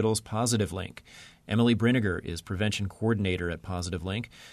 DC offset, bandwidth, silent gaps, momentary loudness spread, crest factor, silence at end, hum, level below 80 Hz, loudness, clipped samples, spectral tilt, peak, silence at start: under 0.1%; 13.5 kHz; none; 13 LU; 16 dB; 0 s; none; -52 dBFS; -29 LUFS; under 0.1%; -5 dB/octave; -12 dBFS; 0 s